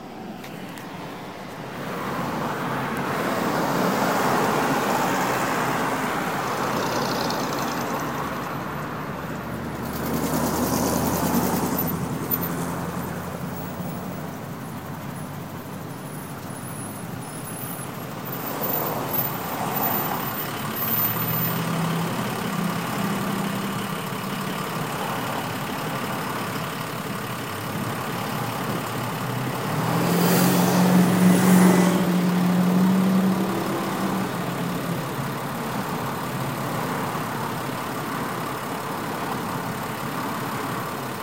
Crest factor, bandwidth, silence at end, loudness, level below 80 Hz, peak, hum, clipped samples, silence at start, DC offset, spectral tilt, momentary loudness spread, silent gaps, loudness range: 20 dB; 16 kHz; 0 s; -25 LUFS; -52 dBFS; -6 dBFS; none; under 0.1%; 0 s; 0.2%; -5 dB/octave; 13 LU; none; 10 LU